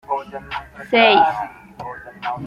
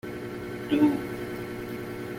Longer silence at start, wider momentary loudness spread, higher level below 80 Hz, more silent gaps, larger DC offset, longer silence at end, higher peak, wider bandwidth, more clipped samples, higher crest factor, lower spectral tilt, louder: about the same, 0.1 s vs 0.05 s; first, 20 LU vs 12 LU; about the same, -52 dBFS vs -56 dBFS; neither; neither; about the same, 0 s vs 0 s; first, -2 dBFS vs -10 dBFS; second, 11.5 kHz vs 16.5 kHz; neither; about the same, 18 dB vs 18 dB; about the same, -5.5 dB/octave vs -6.5 dB/octave; first, -16 LUFS vs -29 LUFS